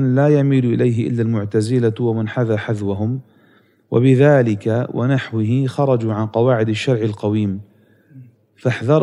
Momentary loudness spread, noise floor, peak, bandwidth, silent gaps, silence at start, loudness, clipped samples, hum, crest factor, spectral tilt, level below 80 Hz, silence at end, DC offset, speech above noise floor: 8 LU; -54 dBFS; -2 dBFS; 11 kHz; none; 0 s; -17 LUFS; under 0.1%; none; 16 dB; -8 dB/octave; -66 dBFS; 0 s; under 0.1%; 38 dB